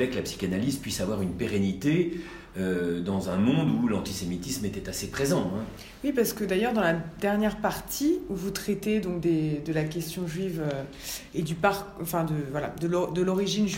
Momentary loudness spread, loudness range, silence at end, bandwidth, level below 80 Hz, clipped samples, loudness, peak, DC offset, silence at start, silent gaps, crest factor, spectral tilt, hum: 7 LU; 2 LU; 0 s; 16.5 kHz; -50 dBFS; under 0.1%; -28 LUFS; -10 dBFS; under 0.1%; 0 s; none; 18 dB; -5.5 dB/octave; none